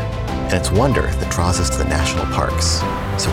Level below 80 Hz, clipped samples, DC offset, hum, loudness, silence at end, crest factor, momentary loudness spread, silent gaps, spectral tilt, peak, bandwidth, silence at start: -26 dBFS; under 0.1%; under 0.1%; none; -18 LUFS; 0 s; 16 dB; 4 LU; none; -4.5 dB/octave; -2 dBFS; 16 kHz; 0 s